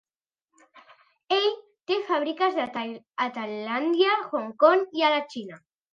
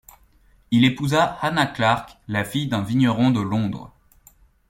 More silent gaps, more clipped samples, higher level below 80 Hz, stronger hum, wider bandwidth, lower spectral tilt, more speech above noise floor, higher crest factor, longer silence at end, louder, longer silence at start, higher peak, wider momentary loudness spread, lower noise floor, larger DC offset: neither; neither; second, -82 dBFS vs -52 dBFS; neither; second, 7.6 kHz vs 16.5 kHz; second, -4.5 dB/octave vs -6 dB/octave; first, 61 dB vs 35 dB; about the same, 20 dB vs 20 dB; second, 0.35 s vs 0.8 s; second, -25 LUFS vs -21 LUFS; about the same, 0.75 s vs 0.7 s; second, -6 dBFS vs -2 dBFS; first, 14 LU vs 8 LU; first, -86 dBFS vs -56 dBFS; neither